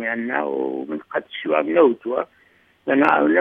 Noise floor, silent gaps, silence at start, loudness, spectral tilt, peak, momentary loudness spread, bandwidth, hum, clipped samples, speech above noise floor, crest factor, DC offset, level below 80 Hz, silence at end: -57 dBFS; none; 0 s; -21 LUFS; -7.5 dB/octave; 0 dBFS; 12 LU; 5 kHz; none; under 0.1%; 37 dB; 20 dB; under 0.1%; -72 dBFS; 0 s